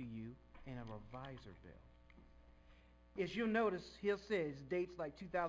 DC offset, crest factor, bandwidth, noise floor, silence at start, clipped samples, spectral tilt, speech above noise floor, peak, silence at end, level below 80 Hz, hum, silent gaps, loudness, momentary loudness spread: under 0.1%; 18 dB; 7.8 kHz; -65 dBFS; 0 s; under 0.1%; -6.5 dB/octave; 23 dB; -26 dBFS; 0 s; -66 dBFS; 60 Hz at -65 dBFS; none; -43 LUFS; 19 LU